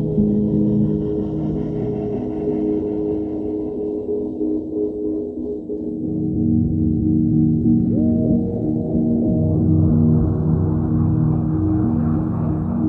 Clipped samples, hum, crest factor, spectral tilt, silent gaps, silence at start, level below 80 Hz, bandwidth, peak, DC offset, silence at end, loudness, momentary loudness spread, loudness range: under 0.1%; none; 14 dB; -13.5 dB/octave; none; 0 s; -36 dBFS; 3.1 kHz; -6 dBFS; under 0.1%; 0 s; -20 LUFS; 8 LU; 5 LU